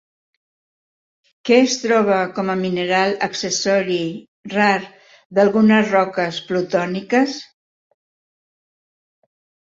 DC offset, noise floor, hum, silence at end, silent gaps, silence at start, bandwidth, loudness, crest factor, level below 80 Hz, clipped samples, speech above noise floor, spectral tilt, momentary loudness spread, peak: under 0.1%; under -90 dBFS; none; 2.25 s; 4.28-4.43 s, 5.25-5.30 s; 1.45 s; 7.8 kHz; -18 LUFS; 18 dB; -64 dBFS; under 0.1%; over 73 dB; -4.5 dB/octave; 9 LU; -2 dBFS